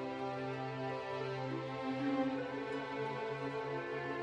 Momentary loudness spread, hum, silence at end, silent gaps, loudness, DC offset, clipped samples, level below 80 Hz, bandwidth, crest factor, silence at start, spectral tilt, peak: 4 LU; none; 0 s; none; -40 LUFS; under 0.1%; under 0.1%; -74 dBFS; 9.4 kHz; 16 dB; 0 s; -7 dB/octave; -24 dBFS